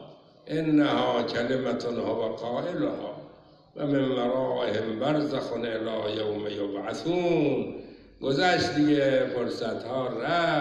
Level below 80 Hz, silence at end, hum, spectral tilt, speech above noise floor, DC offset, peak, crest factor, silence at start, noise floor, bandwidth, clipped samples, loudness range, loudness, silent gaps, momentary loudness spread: -60 dBFS; 0 s; none; -6 dB/octave; 25 dB; under 0.1%; -12 dBFS; 16 dB; 0 s; -52 dBFS; 9.6 kHz; under 0.1%; 3 LU; -27 LUFS; none; 9 LU